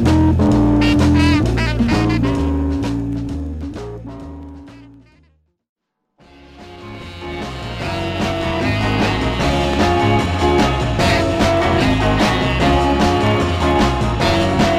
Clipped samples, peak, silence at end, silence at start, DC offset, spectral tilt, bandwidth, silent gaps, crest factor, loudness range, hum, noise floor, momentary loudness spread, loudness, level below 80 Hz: under 0.1%; -2 dBFS; 0 s; 0 s; under 0.1%; -6 dB/octave; 15 kHz; 5.69-5.76 s; 14 dB; 18 LU; none; -57 dBFS; 16 LU; -16 LUFS; -26 dBFS